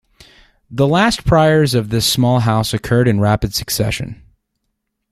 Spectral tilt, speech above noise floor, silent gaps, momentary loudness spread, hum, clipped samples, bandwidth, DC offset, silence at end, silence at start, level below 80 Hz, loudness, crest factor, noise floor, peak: -5 dB/octave; 58 dB; none; 7 LU; none; under 0.1%; 16 kHz; under 0.1%; 1 s; 0.7 s; -36 dBFS; -15 LUFS; 14 dB; -72 dBFS; -2 dBFS